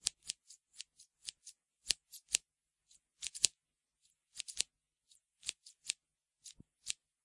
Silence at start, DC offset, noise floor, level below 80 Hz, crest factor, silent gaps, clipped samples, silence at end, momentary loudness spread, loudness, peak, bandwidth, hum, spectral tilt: 0.05 s; under 0.1%; -87 dBFS; -76 dBFS; 42 dB; none; under 0.1%; 0.3 s; 22 LU; -40 LUFS; -2 dBFS; 12 kHz; none; 3 dB/octave